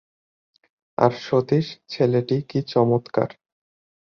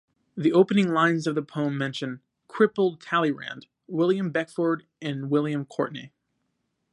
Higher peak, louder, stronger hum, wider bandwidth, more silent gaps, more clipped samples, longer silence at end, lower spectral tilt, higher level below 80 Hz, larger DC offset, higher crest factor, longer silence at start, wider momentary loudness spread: first, -2 dBFS vs -6 dBFS; first, -22 LUFS vs -25 LUFS; neither; second, 6.8 kHz vs 11 kHz; neither; neither; about the same, 0.85 s vs 0.85 s; first, -8 dB/octave vs -6.5 dB/octave; first, -60 dBFS vs -74 dBFS; neither; about the same, 22 dB vs 20 dB; first, 1 s vs 0.35 s; second, 7 LU vs 15 LU